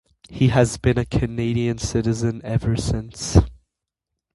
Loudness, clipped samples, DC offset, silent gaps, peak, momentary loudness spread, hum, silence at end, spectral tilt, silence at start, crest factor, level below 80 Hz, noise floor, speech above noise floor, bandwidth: -21 LUFS; under 0.1%; under 0.1%; none; 0 dBFS; 7 LU; none; 0.8 s; -6 dB/octave; 0.3 s; 20 dB; -32 dBFS; -83 dBFS; 63 dB; 11.5 kHz